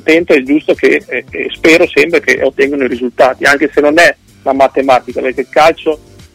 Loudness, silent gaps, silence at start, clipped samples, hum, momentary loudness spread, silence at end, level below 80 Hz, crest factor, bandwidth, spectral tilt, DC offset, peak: -10 LUFS; none; 0.05 s; 0.3%; none; 10 LU; 0.4 s; -44 dBFS; 10 dB; 16.5 kHz; -4 dB/octave; under 0.1%; 0 dBFS